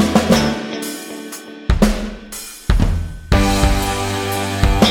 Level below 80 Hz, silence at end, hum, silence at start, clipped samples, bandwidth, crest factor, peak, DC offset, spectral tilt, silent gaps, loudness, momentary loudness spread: -22 dBFS; 0 s; none; 0 s; under 0.1%; 18.5 kHz; 16 dB; -2 dBFS; under 0.1%; -5 dB/octave; none; -18 LUFS; 14 LU